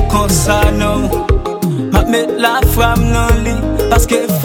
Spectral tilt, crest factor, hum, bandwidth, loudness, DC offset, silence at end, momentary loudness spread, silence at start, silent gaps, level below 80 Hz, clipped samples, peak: -5 dB/octave; 12 dB; none; 17.5 kHz; -13 LUFS; under 0.1%; 0 s; 4 LU; 0 s; none; -18 dBFS; under 0.1%; 0 dBFS